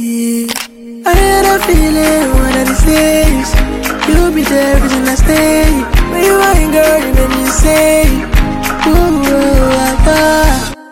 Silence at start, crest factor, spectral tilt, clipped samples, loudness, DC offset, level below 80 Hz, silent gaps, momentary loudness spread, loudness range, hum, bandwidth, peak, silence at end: 0 s; 10 dB; -4.5 dB/octave; under 0.1%; -10 LUFS; 0.4%; -14 dBFS; none; 6 LU; 1 LU; none; 17 kHz; 0 dBFS; 0.1 s